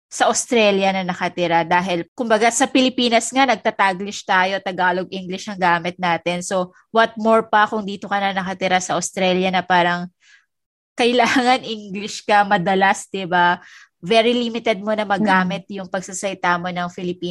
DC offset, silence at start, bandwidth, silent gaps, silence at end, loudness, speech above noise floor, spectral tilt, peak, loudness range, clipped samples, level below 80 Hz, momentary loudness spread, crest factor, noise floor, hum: under 0.1%; 0.1 s; 12.5 kHz; 2.08-2.16 s, 10.66-10.96 s; 0 s; -19 LUFS; 36 dB; -3.5 dB/octave; -2 dBFS; 2 LU; under 0.1%; -62 dBFS; 10 LU; 18 dB; -55 dBFS; none